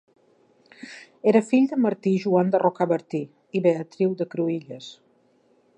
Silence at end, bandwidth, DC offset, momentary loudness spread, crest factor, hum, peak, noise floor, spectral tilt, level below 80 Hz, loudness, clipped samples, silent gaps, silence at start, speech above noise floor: 0.85 s; 9.6 kHz; under 0.1%; 21 LU; 18 dB; none; -6 dBFS; -62 dBFS; -7.5 dB/octave; -78 dBFS; -23 LUFS; under 0.1%; none; 0.8 s; 39 dB